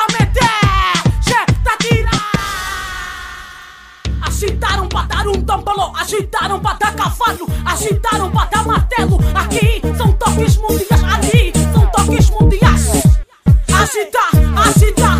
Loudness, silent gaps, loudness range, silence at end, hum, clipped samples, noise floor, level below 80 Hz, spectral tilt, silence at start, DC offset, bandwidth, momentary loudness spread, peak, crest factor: -14 LUFS; none; 6 LU; 0 s; none; under 0.1%; -37 dBFS; -18 dBFS; -5 dB/octave; 0 s; under 0.1%; 16 kHz; 9 LU; 0 dBFS; 12 dB